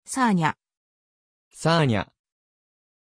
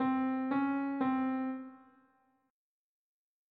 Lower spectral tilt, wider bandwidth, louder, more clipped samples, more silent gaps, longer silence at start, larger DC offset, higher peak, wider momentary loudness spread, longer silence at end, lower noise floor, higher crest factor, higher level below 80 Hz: about the same, -5.5 dB/octave vs -5 dB/octave; first, 10.5 kHz vs 4.3 kHz; first, -23 LUFS vs -34 LUFS; neither; first, 0.77-1.51 s vs none; about the same, 0.1 s vs 0 s; neither; first, -8 dBFS vs -22 dBFS; first, 15 LU vs 10 LU; second, 1 s vs 1.75 s; first, under -90 dBFS vs -78 dBFS; about the same, 18 dB vs 14 dB; first, -58 dBFS vs -80 dBFS